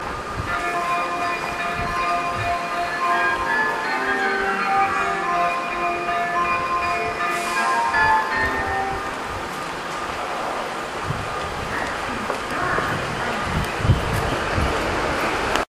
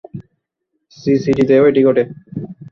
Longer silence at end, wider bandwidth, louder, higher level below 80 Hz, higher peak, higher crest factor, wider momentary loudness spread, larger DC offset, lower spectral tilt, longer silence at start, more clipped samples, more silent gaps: about the same, 0.05 s vs 0.05 s; first, 15.5 kHz vs 7 kHz; second, -22 LUFS vs -14 LUFS; first, -38 dBFS vs -52 dBFS; about the same, 0 dBFS vs -2 dBFS; first, 22 dB vs 14 dB; second, 7 LU vs 19 LU; neither; second, -4.5 dB/octave vs -8 dB/octave; second, 0 s vs 0.15 s; neither; neither